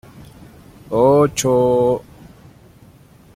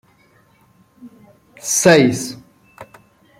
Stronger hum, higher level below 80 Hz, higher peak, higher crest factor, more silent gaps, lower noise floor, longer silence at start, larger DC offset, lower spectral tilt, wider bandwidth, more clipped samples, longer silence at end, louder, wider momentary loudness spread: neither; first, -48 dBFS vs -60 dBFS; about the same, -2 dBFS vs 0 dBFS; about the same, 16 dB vs 20 dB; neither; second, -47 dBFS vs -54 dBFS; second, 0.2 s vs 1.05 s; neither; first, -5.5 dB/octave vs -4 dB/octave; about the same, 16 kHz vs 16.5 kHz; neither; first, 1.4 s vs 0.55 s; about the same, -16 LUFS vs -14 LUFS; second, 9 LU vs 18 LU